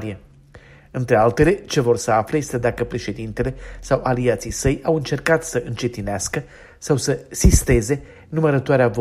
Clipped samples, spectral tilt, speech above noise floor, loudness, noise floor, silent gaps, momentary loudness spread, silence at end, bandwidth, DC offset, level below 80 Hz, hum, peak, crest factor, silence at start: under 0.1%; -5.5 dB/octave; 26 dB; -20 LUFS; -46 dBFS; none; 11 LU; 0 s; 15.5 kHz; under 0.1%; -30 dBFS; none; -2 dBFS; 18 dB; 0 s